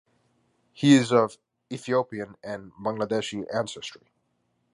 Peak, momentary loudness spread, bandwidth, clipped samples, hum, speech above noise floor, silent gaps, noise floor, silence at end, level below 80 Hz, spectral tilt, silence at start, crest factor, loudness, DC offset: -4 dBFS; 19 LU; 11 kHz; under 0.1%; none; 48 dB; none; -73 dBFS; 0.85 s; -68 dBFS; -5.5 dB/octave; 0.8 s; 22 dB; -25 LUFS; under 0.1%